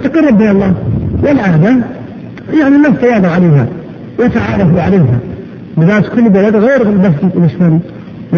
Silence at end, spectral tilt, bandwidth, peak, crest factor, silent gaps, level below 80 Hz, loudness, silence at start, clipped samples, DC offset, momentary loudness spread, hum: 0 s; -9.5 dB/octave; 6.8 kHz; 0 dBFS; 10 dB; none; -32 dBFS; -9 LUFS; 0 s; under 0.1%; under 0.1%; 16 LU; none